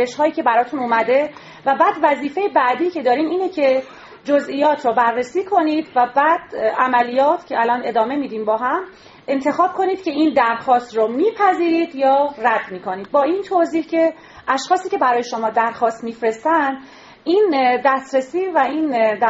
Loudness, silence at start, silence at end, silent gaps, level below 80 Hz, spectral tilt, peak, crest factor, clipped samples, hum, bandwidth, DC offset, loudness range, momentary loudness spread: -18 LUFS; 0 s; 0 s; none; -64 dBFS; -2 dB/octave; -2 dBFS; 16 dB; under 0.1%; none; 8 kHz; under 0.1%; 2 LU; 6 LU